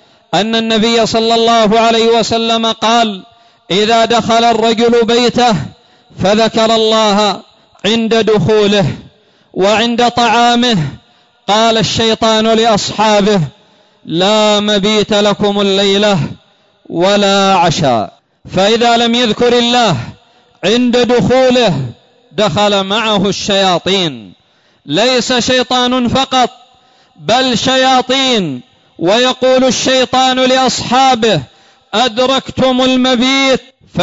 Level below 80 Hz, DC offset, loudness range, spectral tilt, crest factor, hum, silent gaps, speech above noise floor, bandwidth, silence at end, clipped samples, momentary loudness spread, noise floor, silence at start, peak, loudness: -44 dBFS; under 0.1%; 2 LU; -4 dB/octave; 10 dB; none; none; 38 dB; 8 kHz; 0 s; under 0.1%; 8 LU; -48 dBFS; 0.3 s; -2 dBFS; -11 LUFS